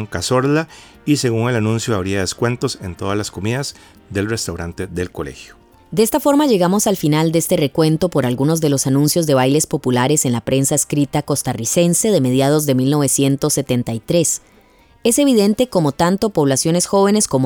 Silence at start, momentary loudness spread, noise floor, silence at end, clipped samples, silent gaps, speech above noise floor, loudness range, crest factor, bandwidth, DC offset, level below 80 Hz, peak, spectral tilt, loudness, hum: 0 s; 9 LU; -50 dBFS; 0 s; under 0.1%; none; 34 dB; 6 LU; 14 dB; over 20 kHz; under 0.1%; -48 dBFS; -2 dBFS; -5 dB/octave; -16 LUFS; none